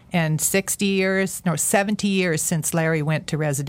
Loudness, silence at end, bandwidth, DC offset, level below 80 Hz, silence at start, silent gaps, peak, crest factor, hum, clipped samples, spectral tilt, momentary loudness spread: -21 LUFS; 0 s; 17 kHz; under 0.1%; -54 dBFS; 0.1 s; none; -6 dBFS; 16 dB; none; under 0.1%; -4.5 dB/octave; 4 LU